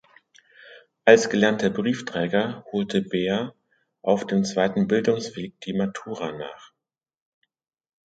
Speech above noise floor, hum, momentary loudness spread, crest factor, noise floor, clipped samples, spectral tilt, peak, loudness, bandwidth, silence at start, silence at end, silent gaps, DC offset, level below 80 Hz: 63 dB; none; 15 LU; 24 dB; -86 dBFS; under 0.1%; -5.5 dB/octave; 0 dBFS; -23 LUFS; 9.2 kHz; 0.65 s; 1.4 s; none; under 0.1%; -64 dBFS